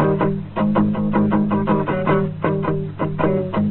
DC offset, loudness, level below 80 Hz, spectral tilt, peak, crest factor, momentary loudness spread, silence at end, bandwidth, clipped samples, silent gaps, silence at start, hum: under 0.1%; -20 LUFS; -44 dBFS; -12.5 dB/octave; -4 dBFS; 16 dB; 4 LU; 0 s; 4.2 kHz; under 0.1%; none; 0 s; none